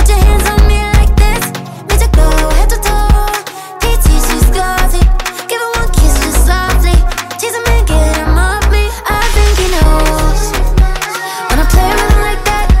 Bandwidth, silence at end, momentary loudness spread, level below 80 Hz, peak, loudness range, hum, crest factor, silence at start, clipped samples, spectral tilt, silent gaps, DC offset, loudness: 16.5 kHz; 0 s; 7 LU; -10 dBFS; 0 dBFS; 1 LU; none; 8 dB; 0 s; under 0.1%; -4.5 dB/octave; none; under 0.1%; -12 LUFS